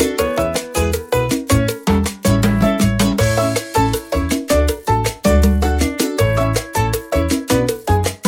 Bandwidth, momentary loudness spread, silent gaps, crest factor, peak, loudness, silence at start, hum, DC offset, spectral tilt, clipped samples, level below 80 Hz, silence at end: 17 kHz; 4 LU; none; 14 dB; -2 dBFS; -17 LUFS; 0 s; none; under 0.1%; -5.5 dB/octave; under 0.1%; -24 dBFS; 0 s